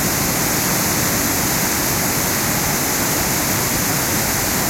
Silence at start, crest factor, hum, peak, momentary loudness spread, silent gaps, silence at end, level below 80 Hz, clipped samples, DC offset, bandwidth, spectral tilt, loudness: 0 s; 14 dB; none; -6 dBFS; 1 LU; none; 0 s; -38 dBFS; under 0.1%; under 0.1%; 16.5 kHz; -2.5 dB/octave; -16 LUFS